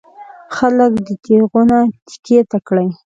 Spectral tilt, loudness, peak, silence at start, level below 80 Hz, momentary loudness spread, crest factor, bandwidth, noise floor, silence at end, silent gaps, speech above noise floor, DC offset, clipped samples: -7.5 dB/octave; -14 LUFS; 0 dBFS; 0.2 s; -50 dBFS; 8 LU; 14 dB; 7.8 kHz; -33 dBFS; 0.2 s; 2.02-2.06 s, 2.19-2.23 s; 19 dB; under 0.1%; under 0.1%